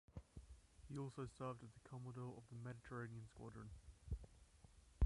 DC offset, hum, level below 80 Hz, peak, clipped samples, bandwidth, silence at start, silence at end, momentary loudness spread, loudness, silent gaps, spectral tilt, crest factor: under 0.1%; none; -54 dBFS; -28 dBFS; under 0.1%; 11.5 kHz; 0.1 s; 0 s; 15 LU; -55 LUFS; none; -7.5 dB/octave; 22 dB